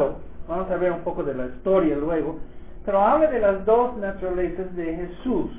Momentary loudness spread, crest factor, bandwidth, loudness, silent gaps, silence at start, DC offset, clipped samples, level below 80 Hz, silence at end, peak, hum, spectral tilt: 11 LU; 16 dB; 4 kHz; -23 LUFS; none; 0 s; 1%; under 0.1%; -42 dBFS; 0 s; -6 dBFS; none; -11 dB/octave